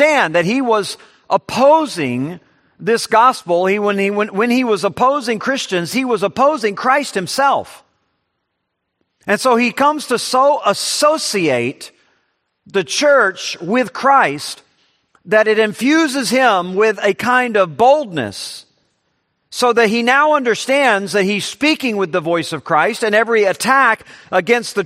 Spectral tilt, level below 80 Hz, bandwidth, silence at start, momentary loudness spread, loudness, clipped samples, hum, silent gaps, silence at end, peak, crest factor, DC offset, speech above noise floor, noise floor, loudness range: -3.5 dB/octave; -64 dBFS; 14 kHz; 0 s; 10 LU; -15 LUFS; under 0.1%; none; none; 0 s; 0 dBFS; 16 dB; under 0.1%; 58 dB; -73 dBFS; 3 LU